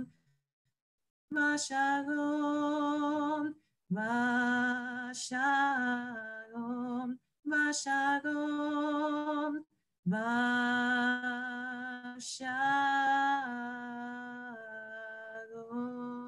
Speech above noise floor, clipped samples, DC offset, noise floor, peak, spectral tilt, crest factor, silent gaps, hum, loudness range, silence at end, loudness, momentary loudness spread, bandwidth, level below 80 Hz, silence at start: 31 dB; under 0.1%; under 0.1%; -63 dBFS; -20 dBFS; -4 dB/octave; 14 dB; 0.53-0.65 s, 0.82-0.98 s, 1.10-1.28 s, 9.99-10.03 s; none; 2 LU; 0 s; -33 LUFS; 14 LU; 11.5 kHz; -82 dBFS; 0 s